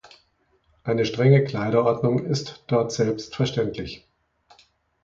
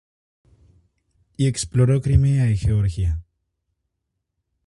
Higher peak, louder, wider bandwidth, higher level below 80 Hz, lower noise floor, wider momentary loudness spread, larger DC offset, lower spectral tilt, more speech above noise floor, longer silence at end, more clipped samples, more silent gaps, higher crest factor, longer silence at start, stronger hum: about the same, -4 dBFS vs -4 dBFS; second, -23 LUFS vs -20 LUFS; second, 7.6 kHz vs 11.5 kHz; second, -56 dBFS vs -32 dBFS; second, -65 dBFS vs -78 dBFS; first, 14 LU vs 8 LU; neither; about the same, -6.5 dB/octave vs -6.5 dB/octave; second, 43 dB vs 60 dB; second, 1.05 s vs 1.45 s; neither; neither; about the same, 20 dB vs 20 dB; second, 0.85 s vs 1.4 s; neither